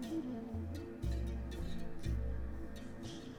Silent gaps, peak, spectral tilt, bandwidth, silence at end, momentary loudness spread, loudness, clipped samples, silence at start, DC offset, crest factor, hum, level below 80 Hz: none; -28 dBFS; -7 dB/octave; 14.5 kHz; 0 s; 7 LU; -44 LUFS; under 0.1%; 0 s; under 0.1%; 12 dB; none; -44 dBFS